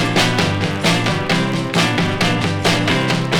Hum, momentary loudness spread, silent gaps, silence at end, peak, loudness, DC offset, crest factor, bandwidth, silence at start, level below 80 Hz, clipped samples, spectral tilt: none; 2 LU; none; 0 s; -2 dBFS; -16 LUFS; under 0.1%; 16 dB; 17.5 kHz; 0 s; -42 dBFS; under 0.1%; -4.5 dB/octave